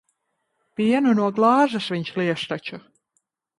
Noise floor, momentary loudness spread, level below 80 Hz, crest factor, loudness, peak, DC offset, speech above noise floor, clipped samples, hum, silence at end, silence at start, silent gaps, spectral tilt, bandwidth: -75 dBFS; 17 LU; -68 dBFS; 18 dB; -21 LUFS; -4 dBFS; under 0.1%; 54 dB; under 0.1%; none; 0.8 s; 0.8 s; none; -6.5 dB/octave; 11.5 kHz